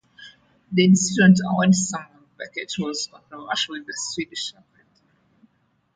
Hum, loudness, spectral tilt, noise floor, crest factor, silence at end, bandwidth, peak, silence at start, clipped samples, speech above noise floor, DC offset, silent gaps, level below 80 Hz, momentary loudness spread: none; -21 LUFS; -4.5 dB/octave; -66 dBFS; 20 dB; 1.45 s; 9.4 kHz; -4 dBFS; 0.2 s; under 0.1%; 45 dB; under 0.1%; none; -62 dBFS; 17 LU